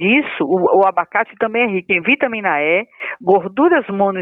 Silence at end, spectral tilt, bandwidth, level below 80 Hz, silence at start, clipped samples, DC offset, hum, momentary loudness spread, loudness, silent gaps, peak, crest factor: 0 s; -8.5 dB/octave; 3.9 kHz; -62 dBFS; 0 s; under 0.1%; under 0.1%; none; 5 LU; -16 LUFS; none; -2 dBFS; 14 dB